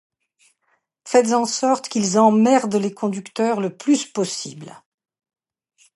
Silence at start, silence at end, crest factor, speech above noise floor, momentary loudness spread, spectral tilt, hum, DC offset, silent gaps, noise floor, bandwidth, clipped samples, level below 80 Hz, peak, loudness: 1.05 s; 1.2 s; 18 dB; 50 dB; 10 LU; -4.5 dB/octave; none; under 0.1%; none; -68 dBFS; 11.5 kHz; under 0.1%; -72 dBFS; -2 dBFS; -19 LUFS